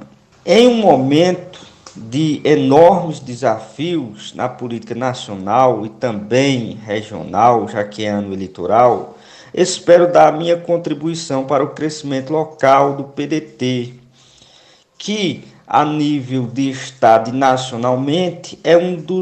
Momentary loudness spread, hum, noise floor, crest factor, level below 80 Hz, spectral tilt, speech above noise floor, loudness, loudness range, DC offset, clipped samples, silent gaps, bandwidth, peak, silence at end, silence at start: 13 LU; none; -49 dBFS; 16 dB; -58 dBFS; -5.5 dB/octave; 34 dB; -15 LUFS; 5 LU; under 0.1%; under 0.1%; none; 9 kHz; 0 dBFS; 0 s; 0 s